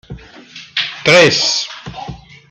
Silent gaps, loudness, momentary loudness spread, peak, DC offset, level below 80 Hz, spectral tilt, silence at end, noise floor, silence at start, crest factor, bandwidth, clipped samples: none; -12 LUFS; 24 LU; 0 dBFS; under 0.1%; -46 dBFS; -2.5 dB/octave; 0.35 s; -37 dBFS; 0.1 s; 16 dB; 15 kHz; under 0.1%